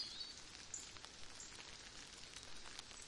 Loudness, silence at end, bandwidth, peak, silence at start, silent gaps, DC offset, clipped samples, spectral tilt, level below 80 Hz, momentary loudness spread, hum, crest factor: -52 LUFS; 0 s; 11.5 kHz; -30 dBFS; 0 s; none; under 0.1%; under 0.1%; -0.5 dB/octave; -68 dBFS; 4 LU; none; 24 dB